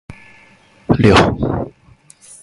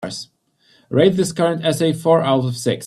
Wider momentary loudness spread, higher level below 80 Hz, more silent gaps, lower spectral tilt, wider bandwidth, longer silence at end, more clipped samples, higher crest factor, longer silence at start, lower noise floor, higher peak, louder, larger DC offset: first, 19 LU vs 7 LU; first, -34 dBFS vs -58 dBFS; neither; about the same, -6.5 dB/octave vs -5.5 dB/octave; second, 11.5 kHz vs 14 kHz; first, 0.75 s vs 0 s; neither; about the same, 18 dB vs 16 dB; about the same, 0.1 s vs 0 s; second, -48 dBFS vs -58 dBFS; about the same, 0 dBFS vs -2 dBFS; first, -14 LUFS vs -17 LUFS; neither